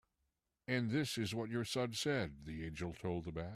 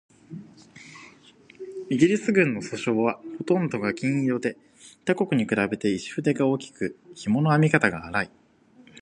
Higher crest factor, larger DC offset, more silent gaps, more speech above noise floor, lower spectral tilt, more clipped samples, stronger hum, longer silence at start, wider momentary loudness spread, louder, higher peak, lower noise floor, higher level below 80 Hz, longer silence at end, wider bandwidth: second, 16 dB vs 22 dB; neither; neither; first, 46 dB vs 32 dB; second, -5 dB/octave vs -6.5 dB/octave; neither; neither; first, 0.7 s vs 0.3 s; second, 8 LU vs 21 LU; second, -40 LUFS vs -25 LUFS; second, -24 dBFS vs -4 dBFS; first, -86 dBFS vs -55 dBFS; about the same, -62 dBFS vs -62 dBFS; second, 0 s vs 0.75 s; first, 14.5 kHz vs 10.5 kHz